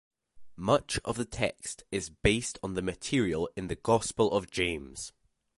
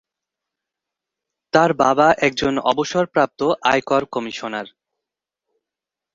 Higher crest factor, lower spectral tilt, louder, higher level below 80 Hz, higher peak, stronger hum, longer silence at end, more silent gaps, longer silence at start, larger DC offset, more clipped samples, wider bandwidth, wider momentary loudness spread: about the same, 24 dB vs 20 dB; about the same, -4.5 dB/octave vs -4.5 dB/octave; second, -31 LUFS vs -18 LUFS; first, -50 dBFS vs -56 dBFS; second, -8 dBFS vs -2 dBFS; neither; second, 0.5 s vs 1.5 s; neither; second, 0.35 s vs 1.55 s; neither; neither; first, 11.5 kHz vs 7.8 kHz; second, 9 LU vs 12 LU